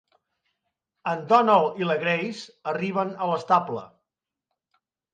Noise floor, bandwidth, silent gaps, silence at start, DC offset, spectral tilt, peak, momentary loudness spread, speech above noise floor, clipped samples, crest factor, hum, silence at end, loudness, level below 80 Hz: -86 dBFS; 9.4 kHz; none; 1.05 s; under 0.1%; -6 dB/octave; -6 dBFS; 15 LU; 62 dB; under 0.1%; 20 dB; none; 1.3 s; -24 LUFS; -76 dBFS